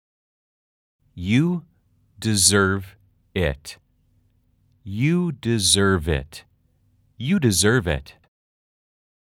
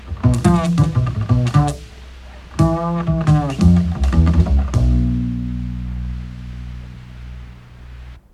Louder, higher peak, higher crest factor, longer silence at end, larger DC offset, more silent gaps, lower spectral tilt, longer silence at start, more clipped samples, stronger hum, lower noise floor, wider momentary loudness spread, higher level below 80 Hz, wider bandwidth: second, -20 LUFS vs -17 LUFS; about the same, 0 dBFS vs 0 dBFS; first, 24 dB vs 18 dB; first, 1.2 s vs 0.15 s; neither; neither; second, -4 dB/octave vs -8 dB/octave; first, 1.15 s vs 0 s; neither; neither; first, -63 dBFS vs -37 dBFS; second, 16 LU vs 22 LU; second, -44 dBFS vs -24 dBFS; first, 18 kHz vs 11.5 kHz